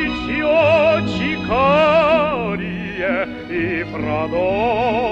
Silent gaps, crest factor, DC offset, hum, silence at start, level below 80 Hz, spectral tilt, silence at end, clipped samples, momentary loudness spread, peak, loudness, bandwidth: none; 14 dB; under 0.1%; none; 0 s; -40 dBFS; -7 dB/octave; 0 s; under 0.1%; 10 LU; -4 dBFS; -17 LUFS; 8 kHz